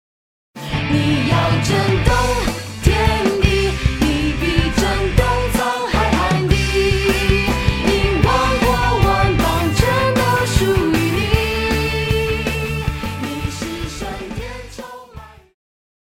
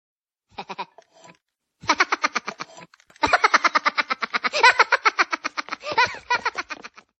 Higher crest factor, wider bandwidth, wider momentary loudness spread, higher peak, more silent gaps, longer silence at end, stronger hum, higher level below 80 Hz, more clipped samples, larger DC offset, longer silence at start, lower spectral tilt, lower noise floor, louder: second, 16 dB vs 22 dB; first, 16.5 kHz vs 8.8 kHz; second, 10 LU vs 20 LU; about the same, 0 dBFS vs -2 dBFS; neither; first, 0.75 s vs 0.35 s; neither; first, -24 dBFS vs -60 dBFS; neither; neither; about the same, 0.55 s vs 0.6 s; first, -5.5 dB/octave vs -1 dB/octave; second, -39 dBFS vs -67 dBFS; first, -17 LUFS vs -21 LUFS